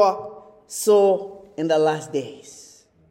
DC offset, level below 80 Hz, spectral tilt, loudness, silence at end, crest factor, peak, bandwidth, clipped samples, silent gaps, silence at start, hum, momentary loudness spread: under 0.1%; -70 dBFS; -4.5 dB/octave; -21 LUFS; 0.5 s; 18 dB; -4 dBFS; 16 kHz; under 0.1%; none; 0 s; none; 21 LU